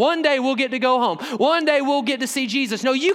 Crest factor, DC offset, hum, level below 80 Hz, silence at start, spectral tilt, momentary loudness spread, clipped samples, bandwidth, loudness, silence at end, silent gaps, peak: 16 dB; under 0.1%; none; -80 dBFS; 0 s; -3 dB/octave; 4 LU; under 0.1%; 16 kHz; -20 LUFS; 0 s; none; -4 dBFS